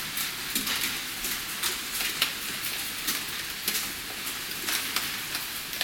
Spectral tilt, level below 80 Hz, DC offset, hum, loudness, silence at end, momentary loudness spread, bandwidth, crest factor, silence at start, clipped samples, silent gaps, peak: 0 dB/octave; -56 dBFS; under 0.1%; none; -29 LUFS; 0 s; 5 LU; 18 kHz; 24 dB; 0 s; under 0.1%; none; -6 dBFS